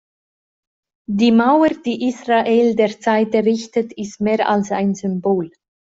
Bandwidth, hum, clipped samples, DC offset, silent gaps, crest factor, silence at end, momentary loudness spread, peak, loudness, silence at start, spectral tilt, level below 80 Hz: 7.8 kHz; none; under 0.1%; under 0.1%; none; 14 dB; 0.4 s; 9 LU; -4 dBFS; -17 LUFS; 1.1 s; -6 dB/octave; -60 dBFS